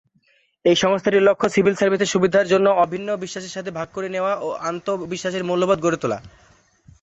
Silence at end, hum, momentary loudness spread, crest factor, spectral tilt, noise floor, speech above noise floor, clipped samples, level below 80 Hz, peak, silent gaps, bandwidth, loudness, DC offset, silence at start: 0.75 s; none; 12 LU; 16 dB; -5 dB/octave; -62 dBFS; 42 dB; under 0.1%; -58 dBFS; -4 dBFS; none; 8.2 kHz; -20 LUFS; under 0.1%; 0.65 s